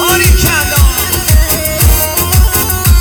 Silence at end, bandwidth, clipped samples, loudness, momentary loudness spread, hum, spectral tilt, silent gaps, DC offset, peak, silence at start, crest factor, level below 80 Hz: 0 s; over 20 kHz; under 0.1%; -9 LUFS; 2 LU; none; -3.5 dB/octave; none; under 0.1%; 0 dBFS; 0 s; 8 dB; -12 dBFS